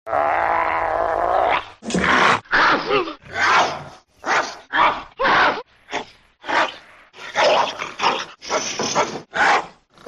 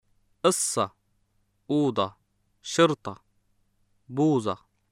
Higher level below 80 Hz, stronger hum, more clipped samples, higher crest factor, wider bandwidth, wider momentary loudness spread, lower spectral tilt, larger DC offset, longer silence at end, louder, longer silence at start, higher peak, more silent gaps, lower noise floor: first, -50 dBFS vs -70 dBFS; neither; neither; second, 16 dB vs 22 dB; second, 12.5 kHz vs 16 kHz; about the same, 14 LU vs 13 LU; second, -2.5 dB/octave vs -4.5 dB/octave; neither; about the same, 0.35 s vs 0.35 s; first, -19 LUFS vs -26 LUFS; second, 0.05 s vs 0.45 s; about the same, -4 dBFS vs -6 dBFS; neither; second, -43 dBFS vs -70 dBFS